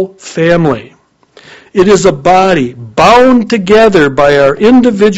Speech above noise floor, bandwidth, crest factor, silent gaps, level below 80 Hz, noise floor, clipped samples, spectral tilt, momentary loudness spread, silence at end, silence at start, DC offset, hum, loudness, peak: 36 dB; 9.8 kHz; 8 dB; none; -36 dBFS; -43 dBFS; 3%; -5.5 dB/octave; 8 LU; 0 s; 0 s; under 0.1%; none; -7 LUFS; 0 dBFS